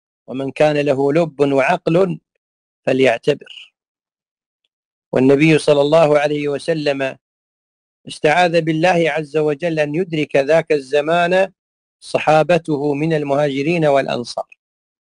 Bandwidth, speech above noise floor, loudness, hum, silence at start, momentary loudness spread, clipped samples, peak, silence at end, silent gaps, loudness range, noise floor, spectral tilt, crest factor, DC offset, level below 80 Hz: 10.5 kHz; over 74 dB; -16 LUFS; none; 0.3 s; 11 LU; under 0.1%; -4 dBFS; 0.75 s; 2.37-2.83 s, 3.88-3.95 s, 4.31-4.37 s, 4.46-4.59 s, 4.73-5.11 s, 7.21-8.04 s, 11.59-11.99 s; 3 LU; under -90 dBFS; -6 dB/octave; 14 dB; under 0.1%; -58 dBFS